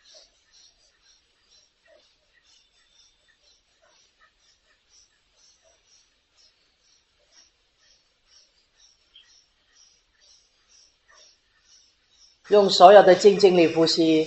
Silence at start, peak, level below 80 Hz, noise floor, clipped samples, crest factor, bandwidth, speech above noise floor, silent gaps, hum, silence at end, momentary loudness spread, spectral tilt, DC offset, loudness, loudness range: 12.5 s; 0 dBFS; -70 dBFS; -64 dBFS; under 0.1%; 24 dB; 8.2 kHz; 49 dB; none; none; 0 s; 9 LU; -4.5 dB/octave; under 0.1%; -15 LUFS; 10 LU